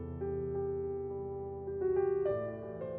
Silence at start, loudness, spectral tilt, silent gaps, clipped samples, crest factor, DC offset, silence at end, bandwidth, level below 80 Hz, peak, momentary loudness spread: 0 s; -36 LUFS; -9.5 dB/octave; none; under 0.1%; 12 dB; under 0.1%; 0 s; 3.2 kHz; -56 dBFS; -22 dBFS; 9 LU